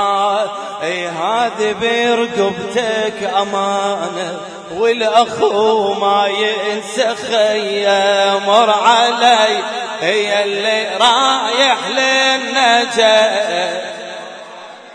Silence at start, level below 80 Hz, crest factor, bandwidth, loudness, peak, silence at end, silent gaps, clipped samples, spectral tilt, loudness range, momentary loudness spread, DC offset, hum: 0 s; -62 dBFS; 14 dB; 10.5 kHz; -14 LUFS; 0 dBFS; 0 s; none; under 0.1%; -2 dB/octave; 4 LU; 11 LU; under 0.1%; none